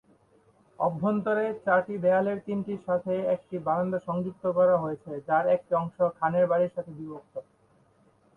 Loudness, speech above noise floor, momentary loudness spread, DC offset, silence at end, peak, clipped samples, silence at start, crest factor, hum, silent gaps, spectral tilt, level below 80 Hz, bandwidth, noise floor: -27 LUFS; 37 dB; 13 LU; under 0.1%; 0.95 s; -10 dBFS; under 0.1%; 0.8 s; 18 dB; none; none; -9.5 dB/octave; -68 dBFS; 3.9 kHz; -63 dBFS